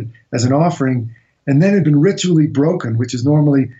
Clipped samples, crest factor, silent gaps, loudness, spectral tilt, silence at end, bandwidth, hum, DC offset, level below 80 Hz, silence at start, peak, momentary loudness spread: under 0.1%; 10 dB; none; -15 LUFS; -7 dB/octave; 0.05 s; 8 kHz; none; under 0.1%; -56 dBFS; 0 s; -4 dBFS; 9 LU